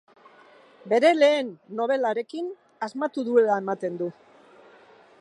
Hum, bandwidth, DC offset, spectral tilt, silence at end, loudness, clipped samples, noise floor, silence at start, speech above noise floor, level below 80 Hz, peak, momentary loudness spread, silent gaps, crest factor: none; 11.5 kHz; under 0.1%; -5 dB/octave; 1.1 s; -24 LUFS; under 0.1%; -53 dBFS; 0.85 s; 30 dB; -84 dBFS; -8 dBFS; 14 LU; none; 18 dB